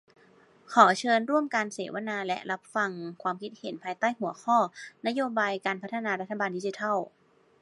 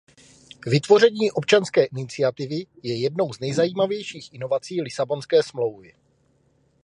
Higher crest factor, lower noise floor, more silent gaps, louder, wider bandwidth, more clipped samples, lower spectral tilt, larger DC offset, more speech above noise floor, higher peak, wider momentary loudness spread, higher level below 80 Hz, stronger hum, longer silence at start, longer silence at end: first, 26 dB vs 20 dB; second, -59 dBFS vs -63 dBFS; neither; second, -28 LUFS vs -22 LUFS; about the same, 11.5 kHz vs 11 kHz; neither; about the same, -4.5 dB/octave vs -5.5 dB/octave; neither; second, 31 dB vs 41 dB; about the same, -4 dBFS vs -2 dBFS; about the same, 12 LU vs 13 LU; second, -84 dBFS vs -66 dBFS; neither; about the same, 0.7 s vs 0.65 s; second, 0.55 s vs 1.1 s